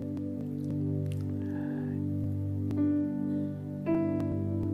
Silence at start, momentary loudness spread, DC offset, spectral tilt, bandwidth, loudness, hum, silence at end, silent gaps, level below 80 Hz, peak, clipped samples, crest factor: 0 s; 7 LU; under 0.1%; -10.5 dB/octave; 10 kHz; -32 LUFS; 50 Hz at -45 dBFS; 0 s; none; -60 dBFS; -18 dBFS; under 0.1%; 14 dB